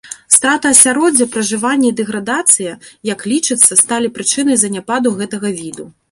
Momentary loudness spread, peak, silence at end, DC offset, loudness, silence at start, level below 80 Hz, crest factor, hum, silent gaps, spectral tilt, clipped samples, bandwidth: 14 LU; 0 dBFS; 0.2 s; under 0.1%; -12 LUFS; 0.05 s; -58 dBFS; 14 dB; none; none; -2 dB/octave; 0.4%; 16 kHz